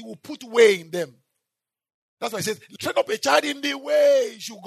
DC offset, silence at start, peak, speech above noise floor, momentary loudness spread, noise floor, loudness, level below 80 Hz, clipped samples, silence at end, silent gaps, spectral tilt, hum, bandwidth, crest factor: under 0.1%; 0 s; -4 dBFS; 64 dB; 15 LU; -86 dBFS; -22 LUFS; -78 dBFS; under 0.1%; 0 s; 1.94-2.17 s; -3 dB/octave; none; 13.5 kHz; 20 dB